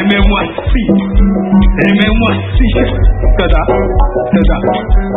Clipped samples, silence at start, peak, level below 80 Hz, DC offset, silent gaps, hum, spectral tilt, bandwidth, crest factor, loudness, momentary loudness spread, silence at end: under 0.1%; 0 s; 0 dBFS; -12 dBFS; under 0.1%; none; none; -9.5 dB/octave; 4 kHz; 10 dB; -11 LUFS; 4 LU; 0 s